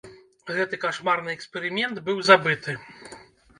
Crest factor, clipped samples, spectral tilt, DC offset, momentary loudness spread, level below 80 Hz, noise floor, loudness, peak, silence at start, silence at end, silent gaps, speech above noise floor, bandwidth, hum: 24 dB; under 0.1%; -4 dB/octave; under 0.1%; 26 LU; -68 dBFS; -48 dBFS; -23 LUFS; 0 dBFS; 0.05 s; 0.4 s; none; 24 dB; 11 kHz; none